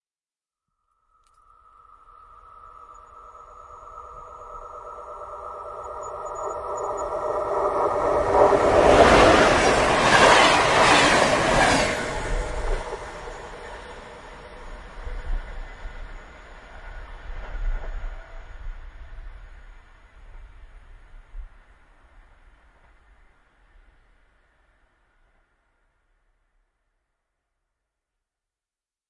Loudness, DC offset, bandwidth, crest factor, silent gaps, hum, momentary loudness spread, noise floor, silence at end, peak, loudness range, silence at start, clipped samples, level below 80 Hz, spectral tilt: -19 LUFS; under 0.1%; 12 kHz; 24 dB; none; none; 27 LU; under -90 dBFS; 7.6 s; -2 dBFS; 24 LU; 2.9 s; under 0.1%; -38 dBFS; -3.5 dB/octave